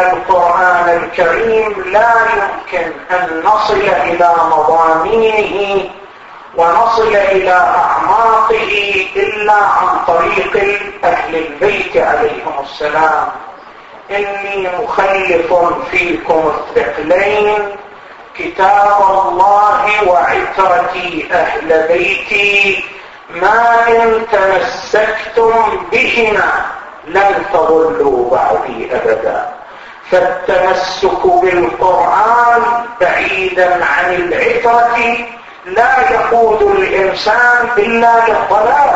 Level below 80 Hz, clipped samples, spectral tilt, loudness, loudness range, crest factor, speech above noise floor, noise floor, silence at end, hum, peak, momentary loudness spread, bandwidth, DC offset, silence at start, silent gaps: -42 dBFS; under 0.1%; -4 dB/octave; -11 LUFS; 3 LU; 12 dB; 23 dB; -34 dBFS; 0 s; none; 0 dBFS; 8 LU; 8 kHz; under 0.1%; 0 s; none